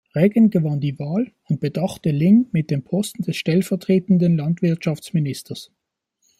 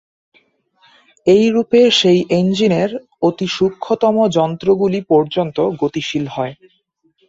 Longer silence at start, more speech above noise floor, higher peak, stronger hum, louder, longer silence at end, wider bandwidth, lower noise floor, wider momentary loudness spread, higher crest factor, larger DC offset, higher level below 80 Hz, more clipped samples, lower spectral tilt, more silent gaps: second, 0.15 s vs 1.25 s; first, 52 dB vs 45 dB; about the same, -4 dBFS vs -2 dBFS; neither; second, -20 LUFS vs -15 LUFS; about the same, 0.75 s vs 0.75 s; first, 15 kHz vs 8 kHz; first, -71 dBFS vs -60 dBFS; about the same, 9 LU vs 9 LU; about the same, 16 dB vs 14 dB; neither; about the same, -60 dBFS vs -56 dBFS; neither; first, -7.5 dB/octave vs -6 dB/octave; neither